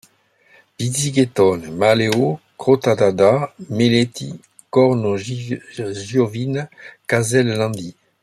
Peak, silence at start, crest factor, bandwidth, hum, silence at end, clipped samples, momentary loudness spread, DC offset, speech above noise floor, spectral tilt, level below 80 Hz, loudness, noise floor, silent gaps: -2 dBFS; 0.8 s; 16 dB; 14 kHz; none; 0.3 s; under 0.1%; 13 LU; under 0.1%; 38 dB; -5.5 dB/octave; -58 dBFS; -18 LUFS; -56 dBFS; none